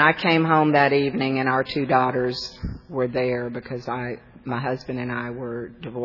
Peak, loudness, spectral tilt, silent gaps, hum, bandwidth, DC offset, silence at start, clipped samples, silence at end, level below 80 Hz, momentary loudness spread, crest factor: -2 dBFS; -23 LUFS; -7 dB/octave; none; none; 6 kHz; under 0.1%; 0 s; under 0.1%; 0 s; -48 dBFS; 14 LU; 20 dB